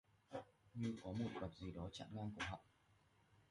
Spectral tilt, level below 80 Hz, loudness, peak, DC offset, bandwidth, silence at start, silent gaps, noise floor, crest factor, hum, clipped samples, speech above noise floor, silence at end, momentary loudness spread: -6 dB/octave; -66 dBFS; -50 LUFS; -34 dBFS; under 0.1%; 11.5 kHz; 0.3 s; none; -76 dBFS; 18 dB; none; under 0.1%; 28 dB; 0.1 s; 9 LU